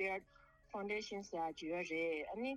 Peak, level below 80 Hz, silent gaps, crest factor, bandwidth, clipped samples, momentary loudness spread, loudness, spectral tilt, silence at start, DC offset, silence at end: -28 dBFS; -72 dBFS; none; 14 dB; 12 kHz; under 0.1%; 7 LU; -43 LUFS; -4.5 dB/octave; 0 s; under 0.1%; 0 s